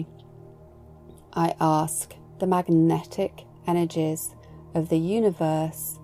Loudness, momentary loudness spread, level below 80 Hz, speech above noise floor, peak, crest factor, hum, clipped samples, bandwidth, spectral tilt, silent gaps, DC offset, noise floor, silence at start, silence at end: -25 LUFS; 12 LU; -56 dBFS; 24 dB; -10 dBFS; 16 dB; none; under 0.1%; 16 kHz; -6.5 dB/octave; none; under 0.1%; -48 dBFS; 0 s; 0 s